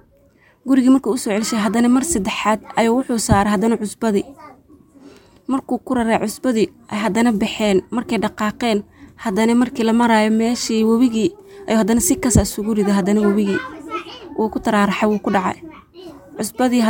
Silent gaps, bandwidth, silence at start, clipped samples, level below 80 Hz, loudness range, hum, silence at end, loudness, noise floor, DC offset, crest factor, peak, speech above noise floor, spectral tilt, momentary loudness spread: none; 17 kHz; 0.65 s; under 0.1%; -40 dBFS; 4 LU; none; 0 s; -18 LUFS; -53 dBFS; under 0.1%; 16 dB; 0 dBFS; 36 dB; -5 dB/octave; 9 LU